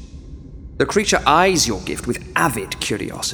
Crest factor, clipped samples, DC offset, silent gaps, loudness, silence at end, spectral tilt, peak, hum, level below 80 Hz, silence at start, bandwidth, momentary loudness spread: 20 dB; under 0.1%; under 0.1%; none; -18 LUFS; 0 s; -3 dB/octave; 0 dBFS; none; -38 dBFS; 0 s; over 20 kHz; 24 LU